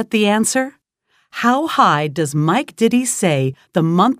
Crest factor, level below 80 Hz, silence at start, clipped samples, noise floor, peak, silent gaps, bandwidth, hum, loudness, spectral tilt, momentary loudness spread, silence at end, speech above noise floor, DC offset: 16 dB; -64 dBFS; 0 s; under 0.1%; -63 dBFS; 0 dBFS; none; 16 kHz; none; -16 LUFS; -4.5 dB/octave; 6 LU; 0.05 s; 47 dB; under 0.1%